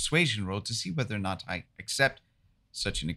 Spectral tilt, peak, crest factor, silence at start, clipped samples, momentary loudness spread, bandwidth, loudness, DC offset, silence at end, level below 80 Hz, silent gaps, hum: -3.5 dB/octave; -10 dBFS; 22 dB; 0 s; under 0.1%; 10 LU; 15 kHz; -30 LUFS; under 0.1%; 0 s; -50 dBFS; none; none